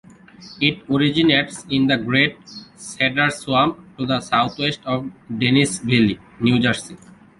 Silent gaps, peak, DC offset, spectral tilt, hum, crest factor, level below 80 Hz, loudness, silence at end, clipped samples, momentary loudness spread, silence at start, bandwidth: none; -2 dBFS; under 0.1%; -5 dB/octave; none; 20 dB; -52 dBFS; -19 LUFS; 0.45 s; under 0.1%; 11 LU; 0.4 s; 11.5 kHz